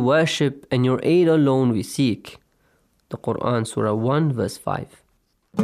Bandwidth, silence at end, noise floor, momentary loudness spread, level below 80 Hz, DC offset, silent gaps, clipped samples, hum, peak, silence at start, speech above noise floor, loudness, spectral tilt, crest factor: 15 kHz; 0 s; -66 dBFS; 14 LU; -60 dBFS; under 0.1%; none; under 0.1%; none; -6 dBFS; 0 s; 46 dB; -21 LUFS; -6.5 dB/octave; 14 dB